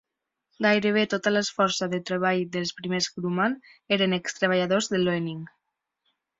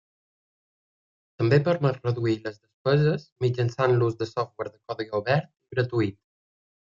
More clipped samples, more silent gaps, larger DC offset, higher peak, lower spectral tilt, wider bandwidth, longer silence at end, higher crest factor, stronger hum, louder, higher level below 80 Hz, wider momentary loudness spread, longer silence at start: neither; second, none vs 2.74-2.85 s, 3.32-3.36 s; neither; about the same, -6 dBFS vs -8 dBFS; second, -4.5 dB/octave vs -8 dB/octave; about the same, 7.8 kHz vs 7.4 kHz; about the same, 0.95 s vs 0.85 s; about the same, 20 dB vs 20 dB; neither; about the same, -25 LUFS vs -26 LUFS; second, -68 dBFS vs -62 dBFS; second, 7 LU vs 10 LU; second, 0.6 s vs 1.4 s